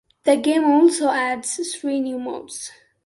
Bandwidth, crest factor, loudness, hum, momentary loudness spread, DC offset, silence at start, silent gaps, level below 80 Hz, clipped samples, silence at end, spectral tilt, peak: 11.5 kHz; 16 dB; -20 LUFS; none; 16 LU; under 0.1%; 0.25 s; none; -68 dBFS; under 0.1%; 0.35 s; -2.5 dB/octave; -4 dBFS